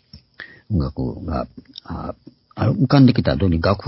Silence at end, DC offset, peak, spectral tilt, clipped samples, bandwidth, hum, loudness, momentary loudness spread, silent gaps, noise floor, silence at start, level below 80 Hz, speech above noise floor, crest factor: 0 s; under 0.1%; 0 dBFS; -11.5 dB/octave; under 0.1%; 5.8 kHz; none; -19 LUFS; 25 LU; none; -42 dBFS; 0.15 s; -34 dBFS; 23 dB; 20 dB